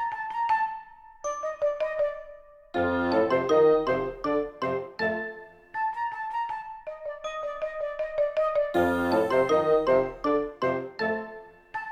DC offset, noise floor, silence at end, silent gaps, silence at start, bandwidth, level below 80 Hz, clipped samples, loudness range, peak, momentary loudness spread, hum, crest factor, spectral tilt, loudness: under 0.1%; -48 dBFS; 0 s; none; 0 s; 13 kHz; -56 dBFS; under 0.1%; 7 LU; -12 dBFS; 15 LU; none; 16 dB; -5.5 dB/octave; -27 LUFS